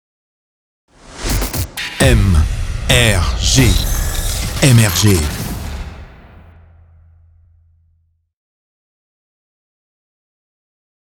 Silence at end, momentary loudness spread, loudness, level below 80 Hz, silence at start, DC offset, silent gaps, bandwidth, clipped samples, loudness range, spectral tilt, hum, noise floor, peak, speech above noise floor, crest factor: 5 s; 14 LU; -14 LUFS; -22 dBFS; 1.1 s; under 0.1%; none; over 20 kHz; under 0.1%; 10 LU; -4 dB/octave; none; -59 dBFS; 0 dBFS; 49 dB; 18 dB